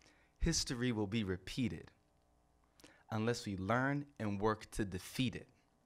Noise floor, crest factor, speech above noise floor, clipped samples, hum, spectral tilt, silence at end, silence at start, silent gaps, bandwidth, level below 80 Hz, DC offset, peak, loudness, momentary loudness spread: -73 dBFS; 20 dB; 35 dB; under 0.1%; none; -5 dB/octave; 0.4 s; 0.4 s; none; 16 kHz; -54 dBFS; under 0.1%; -20 dBFS; -39 LUFS; 7 LU